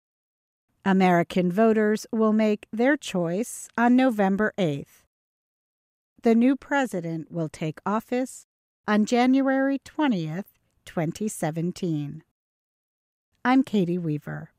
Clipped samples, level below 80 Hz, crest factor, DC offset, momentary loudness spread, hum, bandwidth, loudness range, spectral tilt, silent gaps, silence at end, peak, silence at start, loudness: under 0.1%; -66 dBFS; 16 dB; under 0.1%; 11 LU; none; 15 kHz; 6 LU; -6.5 dB/octave; 5.07-6.16 s, 8.44-8.84 s, 12.31-13.32 s; 0.15 s; -8 dBFS; 0.85 s; -24 LUFS